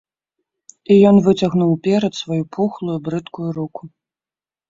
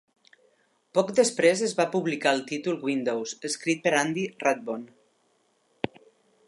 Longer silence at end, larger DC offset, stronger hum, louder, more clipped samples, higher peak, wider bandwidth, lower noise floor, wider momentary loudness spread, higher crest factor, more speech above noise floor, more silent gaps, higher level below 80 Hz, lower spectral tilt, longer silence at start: second, 0.8 s vs 1.6 s; neither; neither; first, -17 LUFS vs -26 LUFS; neither; first, -2 dBFS vs -6 dBFS; second, 7.6 kHz vs 11.5 kHz; first, under -90 dBFS vs -69 dBFS; first, 16 LU vs 13 LU; about the same, 16 dB vs 20 dB; first, over 74 dB vs 43 dB; neither; first, -56 dBFS vs -74 dBFS; first, -7.5 dB/octave vs -3.5 dB/octave; about the same, 0.9 s vs 0.95 s